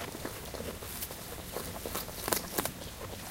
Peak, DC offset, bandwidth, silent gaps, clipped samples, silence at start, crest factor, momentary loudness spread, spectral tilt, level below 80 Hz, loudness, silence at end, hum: -8 dBFS; under 0.1%; 17 kHz; none; under 0.1%; 0 s; 30 dB; 10 LU; -3 dB/octave; -52 dBFS; -37 LUFS; 0 s; none